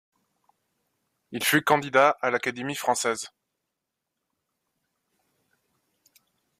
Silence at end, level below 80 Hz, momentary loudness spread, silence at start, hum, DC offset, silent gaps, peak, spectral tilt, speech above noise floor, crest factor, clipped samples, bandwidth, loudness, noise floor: 3.35 s; -72 dBFS; 12 LU; 1.3 s; none; under 0.1%; none; -6 dBFS; -3 dB/octave; 60 dB; 24 dB; under 0.1%; 15.5 kHz; -24 LUFS; -84 dBFS